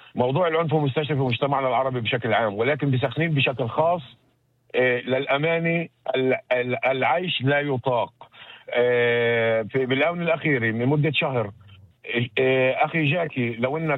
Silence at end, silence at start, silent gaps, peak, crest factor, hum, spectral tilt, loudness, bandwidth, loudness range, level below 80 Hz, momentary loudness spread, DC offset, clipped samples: 0 s; 0.15 s; none; -8 dBFS; 14 dB; none; -9 dB/octave; -23 LUFS; 4.7 kHz; 2 LU; -64 dBFS; 6 LU; under 0.1%; under 0.1%